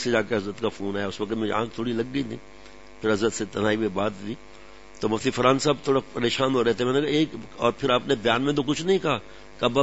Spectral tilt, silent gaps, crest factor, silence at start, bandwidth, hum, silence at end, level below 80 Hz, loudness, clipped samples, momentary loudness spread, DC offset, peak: -5 dB/octave; none; 20 dB; 0 s; 8 kHz; none; 0 s; -54 dBFS; -25 LUFS; under 0.1%; 8 LU; 0.5%; -4 dBFS